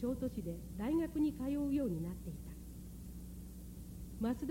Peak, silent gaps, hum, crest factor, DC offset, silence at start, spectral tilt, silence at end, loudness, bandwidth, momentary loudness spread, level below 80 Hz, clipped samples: -26 dBFS; none; none; 14 dB; under 0.1%; 0 s; -7.5 dB/octave; 0 s; -40 LUFS; 16.5 kHz; 15 LU; -52 dBFS; under 0.1%